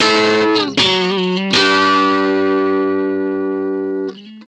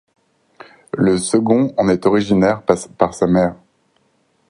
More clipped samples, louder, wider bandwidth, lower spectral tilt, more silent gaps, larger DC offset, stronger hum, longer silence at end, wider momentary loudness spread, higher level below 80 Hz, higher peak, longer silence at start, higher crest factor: neither; about the same, -14 LUFS vs -16 LUFS; second, 9.6 kHz vs 11.5 kHz; second, -4 dB/octave vs -6 dB/octave; neither; neither; neither; second, 0.05 s vs 0.95 s; first, 8 LU vs 5 LU; second, -58 dBFS vs -48 dBFS; about the same, -2 dBFS vs 0 dBFS; second, 0 s vs 0.95 s; about the same, 14 dB vs 18 dB